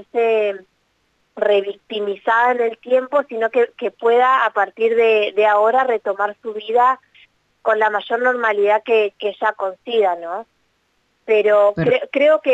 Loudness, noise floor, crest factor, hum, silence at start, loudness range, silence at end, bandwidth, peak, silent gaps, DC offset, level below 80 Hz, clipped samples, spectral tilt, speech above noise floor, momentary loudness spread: -17 LUFS; -65 dBFS; 12 dB; none; 0.15 s; 3 LU; 0 s; 7.8 kHz; -4 dBFS; none; under 0.1%; -62 dBFS; under 0.1%; -6 dB/octave; 48 dB; 10 LU